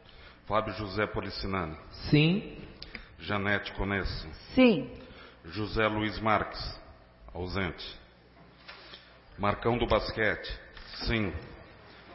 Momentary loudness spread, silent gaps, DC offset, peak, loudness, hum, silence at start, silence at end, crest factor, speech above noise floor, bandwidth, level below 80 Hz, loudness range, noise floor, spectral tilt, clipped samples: 24 LU; none; under 0.1%; -8 dBFS; -30 LUFS; none; 0.05 s; 0 s; 22 dB; 27 dB; 5.8 kHz; -46 dBFS; 6 LU; -56 dBFS; -9.5 dB/octave; under 0.1%